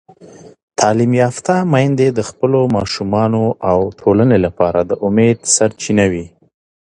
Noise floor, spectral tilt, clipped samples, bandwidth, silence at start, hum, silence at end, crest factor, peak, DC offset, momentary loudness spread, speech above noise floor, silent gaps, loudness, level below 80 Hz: -40 dBFS; -5.5 dB/octave; under 0.1%; 11 kHz; 0.2 s; none; 0.6 s; 14 dB; 0 dBFS; under 0.1%; 4 LU; 26 dB; 0.63-0.68 s; -14 LUFS; -42 dBFS